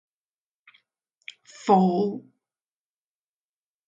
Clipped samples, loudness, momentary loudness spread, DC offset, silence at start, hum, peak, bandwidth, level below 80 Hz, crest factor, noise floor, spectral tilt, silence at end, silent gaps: under 0.1%; -23 LUFS; 25 LU; under 0.1%; 1.65 s; none; -6 dBFS; 7.6 kHz; -78 dBFS; 24 dB; under -90 dBFS; -7.5 dB/octave; 1.7 s; none